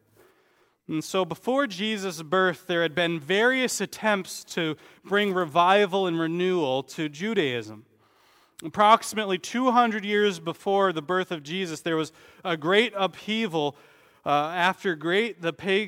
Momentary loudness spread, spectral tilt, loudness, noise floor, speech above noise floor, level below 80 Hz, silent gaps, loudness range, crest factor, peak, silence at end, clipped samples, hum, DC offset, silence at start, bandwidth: 10 LU; -4 dB/octave; -25 LUFS; -65 dBFS; 40 dB; -74 dBFS; none; 3 LU; 22 dB; -4 dBFS; 0 s; under 0.1%; none; under 0.1%; 0.9 s; 16.5 kHz